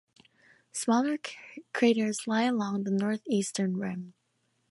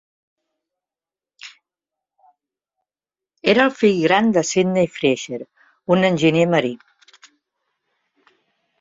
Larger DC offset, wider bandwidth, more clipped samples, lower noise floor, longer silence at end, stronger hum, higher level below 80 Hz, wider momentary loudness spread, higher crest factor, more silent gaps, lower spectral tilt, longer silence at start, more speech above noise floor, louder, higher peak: neither; first, 11.5 kHz vs 7.8 kHz; neither; second, -75 dBFS vs under -90 dBFS; second, 0.6 s vs 2.05 s; neither; second, -76 dBFS vs -62 dBFS; second, 14 LU vs 23 LU; about the same, 18 dB vs 20 dB; neither; about the same, -5 dB/octave vs -5 dB/octave; second, 0.75 s vs 1.45 s; second, 46 dB vs over 73 dB; second, -29 LUFS vs -18 LUFS; second, -12 dBFS vs -2 dBFS